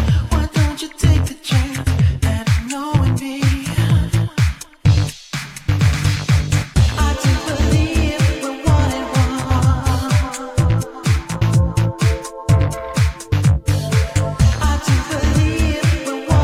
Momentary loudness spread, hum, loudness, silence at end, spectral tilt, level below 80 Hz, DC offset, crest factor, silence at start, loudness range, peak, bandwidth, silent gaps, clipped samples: 4 LU; none; -18 LUFS; 0 s; -5.5 dB/octave; -24 dBFS; under 0.1%; 14 dB; 0 s; 1 LU; -2 dBFS; 15.5 kHz; none; under 0.1%